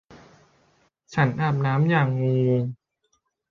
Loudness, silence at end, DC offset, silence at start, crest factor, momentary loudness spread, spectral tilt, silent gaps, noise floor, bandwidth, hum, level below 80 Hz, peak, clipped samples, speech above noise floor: -23 LUFS; 0.75 s; under 0.1%; 0.1 s; 16 dB; 6 LU; -8.5 dB/octave; none; -72 dBFS; 7 kHz; none; -60 dBFS; -8 dBFS; under 0.1%; 50 dB